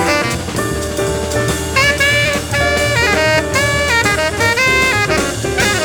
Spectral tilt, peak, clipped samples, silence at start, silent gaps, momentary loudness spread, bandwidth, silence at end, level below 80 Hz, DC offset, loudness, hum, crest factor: -3.5 dB/octave; 0 dBFS; under 0.1%; 0 s; none; 7 LU; over 20 kHz; 0 s; -30 dBFS; under 0.1%; -13 LUFS; none; 14 dB